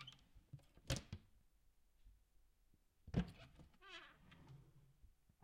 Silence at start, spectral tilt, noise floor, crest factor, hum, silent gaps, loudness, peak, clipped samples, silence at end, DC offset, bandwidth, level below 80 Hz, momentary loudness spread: 0 s; -5 dB/octave; -75 dBFS; 28 dB; none; none; -50 LUFS; -26 dBFS; under 0.1%; 0.3 s; under 0.1%; 16 kHz; -62 dBFS; 20 LU